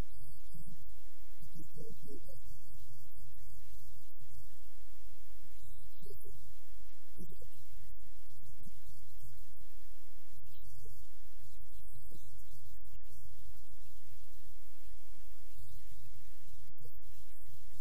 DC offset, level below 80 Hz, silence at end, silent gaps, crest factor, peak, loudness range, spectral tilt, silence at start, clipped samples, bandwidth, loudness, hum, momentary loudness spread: 6%; -58 dBFS; 0 s; none; 18 dB; -24 dBFS; 3 LU; -6 dB/octave; 0 s; under 0.1%; 15.5 kHz; -59 LUFS; none; 6 LU